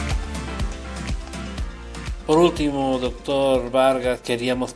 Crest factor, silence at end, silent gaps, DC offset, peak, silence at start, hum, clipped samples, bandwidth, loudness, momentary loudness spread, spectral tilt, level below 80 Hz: 20 dB; 0 s; none; under 0.1%; -4 dBFS; 0 s; none; under 0.1%; 11 kHz; -23 LUFS; 14 LU; -5.5 dB/octave; -32 dBFS